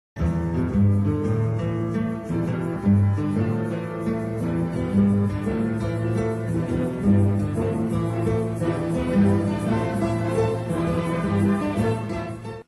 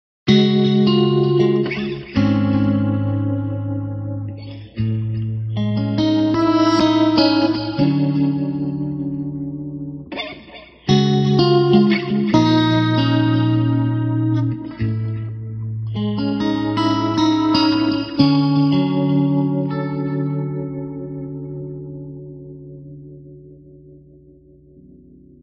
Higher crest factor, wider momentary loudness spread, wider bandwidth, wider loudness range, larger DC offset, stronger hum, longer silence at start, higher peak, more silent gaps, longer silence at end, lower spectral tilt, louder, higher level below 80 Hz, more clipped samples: about the same, 14 dB vs 18 dB; second, 6 LU vs 15 LU; first, 12 kHz vs 6.8 kHz; second, 2 LU vs 10 LU; neither; neither; about the same, 0.15 s vs 0.25 s; second, -8 dBFS vs 0 dBFS; neither; second, 0.05 s vs 1.45 s; about the same, -8.5 dB/octave vs -7.5 dB/octave; second, -23 LUFS vs -18 LUFS; first, -40 dBFS vs -48 dBFS; neither